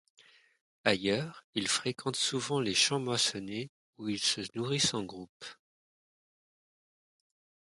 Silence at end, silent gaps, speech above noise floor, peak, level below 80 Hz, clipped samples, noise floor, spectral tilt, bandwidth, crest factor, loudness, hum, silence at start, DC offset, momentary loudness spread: 2.1 s; 1.44-1.53 s, 3.69-3.93 s, 5.29-5.40 s; over 57 dB; -8 dBFS; -70 dBFS; under 0.1%; under -90 dBFS; -3 dB/octave; 11.5 kHz; 26 dB; -31 LUFS; none; 0.85 s; under 0.1%; 16 LU